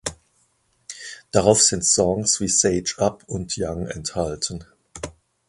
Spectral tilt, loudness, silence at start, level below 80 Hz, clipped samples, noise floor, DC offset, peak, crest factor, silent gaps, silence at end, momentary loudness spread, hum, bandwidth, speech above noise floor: -3 dB/octave; -20 LUFS; 0.05 s; -46 dBFS; under 0.1%; -65 dBFS; under 0.1%; 0 dBFS; 22 dB; none; 0.4 s; 20 LU; none; 11.5 kHz; 44 dB